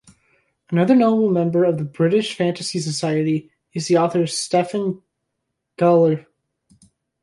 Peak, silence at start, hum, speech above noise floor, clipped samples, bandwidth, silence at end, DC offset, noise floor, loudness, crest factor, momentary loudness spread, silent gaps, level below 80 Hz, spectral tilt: -4 dBFS; 0.7 s; none; 59 dB; under 0.1%; 11.5 kHz; 1.05 s; under 0.1%; -77 dBFS; -19 LUFS; 16 dB; 11 LU; none; -66 dBFS; -6 dB/octave